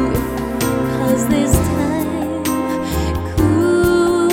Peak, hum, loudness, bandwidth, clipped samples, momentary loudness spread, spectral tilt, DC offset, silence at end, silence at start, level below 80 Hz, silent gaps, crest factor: 0 dBFS; none; -17 LUFS; 17 kHz; under 0.1%; 6 LU; -6 dB/octave; under 0.1%; 0 s; 0 s; -28 dBFS; none; 16 dB